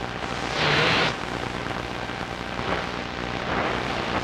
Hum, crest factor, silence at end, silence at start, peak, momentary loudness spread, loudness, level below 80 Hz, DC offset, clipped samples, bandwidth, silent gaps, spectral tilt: none; 18 dB; 0 s; 0 s; -10 dBFS; 10 LU; -26 LUFS; -44 dBFS; under 0.1%; under 0.1%; 15.5 kHz; none; -4.5 dB/octave